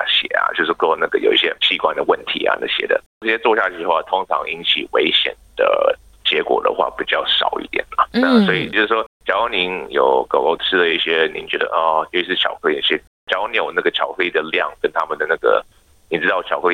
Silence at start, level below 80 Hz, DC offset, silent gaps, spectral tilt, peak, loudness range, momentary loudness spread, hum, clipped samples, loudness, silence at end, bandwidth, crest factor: 0 s; -54 dBFS; under 0.1%; 3.06-3.21 s, 9.06-9.20 s, 13.07-13.27 s; -5 dB/octave; -2 dBFS; 2 LU; 5 LU; none; under 0.1%; -17 LUFS; 0 s; 10.5 kHz; 16 dB